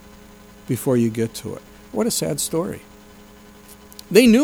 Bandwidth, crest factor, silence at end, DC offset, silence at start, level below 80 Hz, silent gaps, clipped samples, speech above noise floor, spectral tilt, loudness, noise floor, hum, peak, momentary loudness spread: over 20 kHz; 22 dB; 0 s; under 0.1%; 0.7 s; -50 dBFS; none; under 0.1%; 27 dB; -5 dB/octave; -21 LUFS; -45 dBFS; 60 Hz at -50 dBFS; 0 dBFS; 22 LU